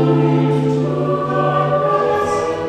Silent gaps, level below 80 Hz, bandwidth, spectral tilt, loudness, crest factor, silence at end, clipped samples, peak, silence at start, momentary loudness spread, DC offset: none; -48 dBFS; 9.4 kHz; -8 dB/octave; -16 LUFS; 14 dB; 0 s; under 0.1%; -2 dBFS; 0 s; 4 LU; under 0.1%